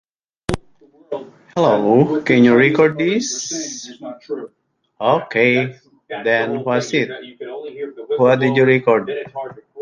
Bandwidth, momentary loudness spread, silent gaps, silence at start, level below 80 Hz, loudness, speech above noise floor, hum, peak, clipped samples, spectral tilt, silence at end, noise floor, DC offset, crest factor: 11 kHz; 17 LU; none; 0.5 s; -50 dBFS; -16 LUFS; 34 dB; none; 0 dBFS; under 0.1%; -5 dB/octave; 0 s; -51 dBFS; under 0.1%; 18 dB